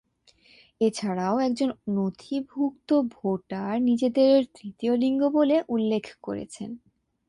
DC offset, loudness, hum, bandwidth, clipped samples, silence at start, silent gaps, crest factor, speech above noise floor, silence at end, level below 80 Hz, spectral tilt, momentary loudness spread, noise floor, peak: under 0.1%; -25 LUFS; none; 11 kHz; under 0.1%; 0.8 s; none; 16 dB; 36 dB; 0.5 s; -66 dBFS; -6.5 dB/octave; 14 LU; -60 dBFS; -10 dBFS